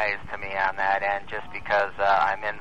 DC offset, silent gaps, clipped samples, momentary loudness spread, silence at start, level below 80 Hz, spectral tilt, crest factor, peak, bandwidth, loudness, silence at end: 1%; none; under 0.1%; 9 LU; 0 s; -52 dBFS; -4.5 dB/octave; 16 dB; -10 dBFS; 8.8 kHz; -25 LUFS; 0 s